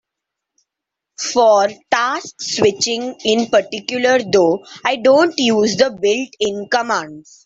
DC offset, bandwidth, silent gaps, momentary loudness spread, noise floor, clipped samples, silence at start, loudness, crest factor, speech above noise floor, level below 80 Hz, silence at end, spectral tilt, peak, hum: under 0.1%; 8 kHz; none; 9 LU; -82 dBFS; under 0.1%; 1.2 s; -16 LUFS; 16 dB; 66 dB; -60 dBFS; 0.25 s; -3 dB/octave; 0 dBFS; none